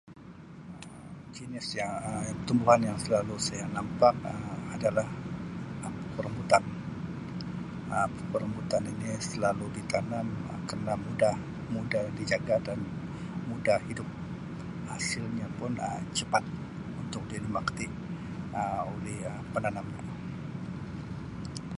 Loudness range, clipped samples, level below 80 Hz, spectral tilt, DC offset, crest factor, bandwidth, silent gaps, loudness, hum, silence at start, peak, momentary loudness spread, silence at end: 6 LU; under 0.1%; -54 dBFS; -5.5 dB/octave; under 0.1%; 24 dB; 11.5 kHz; none; -32 LUFS; none; 0.05 s; -8 dBFS; 13 LU; 0 s